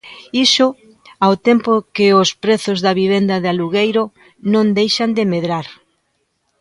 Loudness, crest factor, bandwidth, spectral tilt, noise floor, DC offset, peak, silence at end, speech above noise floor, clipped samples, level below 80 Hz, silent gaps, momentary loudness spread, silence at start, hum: -15 LUFS; 16 dB; 11.5 kHz; -4.5 dB/octave; -67 dBFS; under 0.1%; 0 dBFS; 0.9 s; 52 dB; under 0.1%; -60 dBFS; none; 9 LU; 0.05 s; none